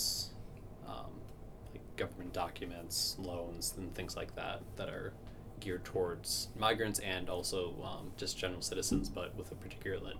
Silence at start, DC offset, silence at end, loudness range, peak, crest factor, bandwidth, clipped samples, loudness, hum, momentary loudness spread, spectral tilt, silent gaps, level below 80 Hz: 0 s; under 0.1%; 0 s; 5 LU; -16 dBFS; 24 dB; over 20 kHz; under 0.1%; -39 LUFS; none; 16 LU; -3 dB/octave; none; -52 dBFS